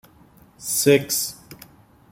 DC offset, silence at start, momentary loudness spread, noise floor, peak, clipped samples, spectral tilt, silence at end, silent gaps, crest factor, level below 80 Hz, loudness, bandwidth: under 0.1%; 0.6 s; 17 LU; -52 dBFS; -4 dBFS; under 0.1%; -3.5 dB/octave; 0.55 s; none; 20 dB; -60 dBFS; -20 LUFS; 16.5 kHz